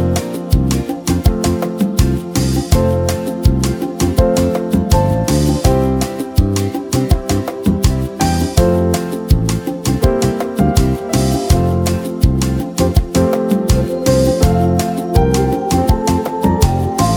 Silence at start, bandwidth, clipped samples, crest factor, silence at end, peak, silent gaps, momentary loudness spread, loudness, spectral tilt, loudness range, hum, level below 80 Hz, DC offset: 0 s; over 20 kHz; under 0.1%; 14 dB; 0 s; 0 dBFS; none; 4 LU; -15 LUFS; -6 dB/octave; 2 LU; none; -20 dBFS; under 0.1%